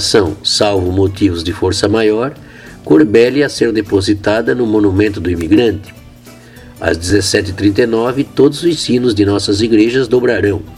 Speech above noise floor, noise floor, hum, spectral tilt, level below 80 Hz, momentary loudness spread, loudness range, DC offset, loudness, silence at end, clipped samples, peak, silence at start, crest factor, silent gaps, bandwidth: 25 dB; -37 dBFS; none; -5 dB/octave; -38 dBFS; 5 LU; 2 LU; under 0.1%; -12 LUFS; 0 s; under 0.1%; 0 dBFS; 0 s; 12 dB; none; 14 kHz